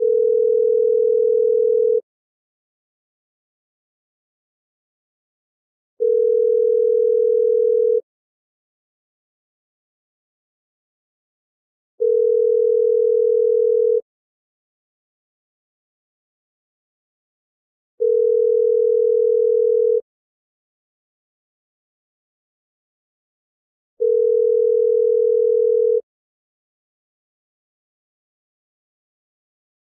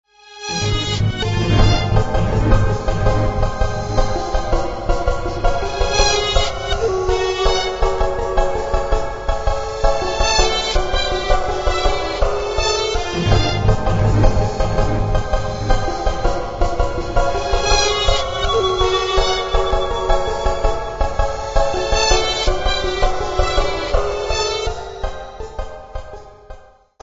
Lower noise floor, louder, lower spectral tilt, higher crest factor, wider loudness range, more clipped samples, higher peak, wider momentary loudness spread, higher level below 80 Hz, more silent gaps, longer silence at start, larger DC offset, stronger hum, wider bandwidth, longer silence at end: first, under -90 dBFS vs -42 dBFS; about the same, -17 LUFS vs -19 LUFS; first, -10 dB/octave vs -4.5 dB/octave; about the same, 12 dB vs 16 dB; first, 8 LU vs 3 LU; neither; second, -10 dBFS vs 0 dBFS; second, 3 LU vs 7 LU; second, under -90 dBFS vs -22 dBFS; first, 2.03-5.97 s, 8.03-11.98 s, 14.02-17.98 s, 20.02-23.97 s vs none; second, 0 s vs 0.3 s; neither; neither; second, 0.6 kHz vs 8 kHz; first, 4 s vs 0.45 s